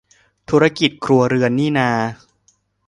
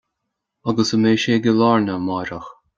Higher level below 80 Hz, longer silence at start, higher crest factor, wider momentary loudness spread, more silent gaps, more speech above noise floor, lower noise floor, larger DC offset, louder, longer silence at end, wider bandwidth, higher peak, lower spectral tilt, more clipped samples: about the same, -54 dBFS vs -56 dBFS; second, 0.5 s vs 0.65 s; about the same, 18 dB vs 16 dB; second, 5 LU vs 13 LU; neither; second, 45 dB vs 61 dB; second, -61 dBFS vs -78 dBFS; neither; about the same, -17 LUFS vs -18 LUFS; first, 0.75 s vs 0.25 s; first, 11 kHz vs 7.6 kHz; about the same, 0 dBFS vs -2 dBFS; about the same, -6 dB/octave vs -5.5 dB/octave; neither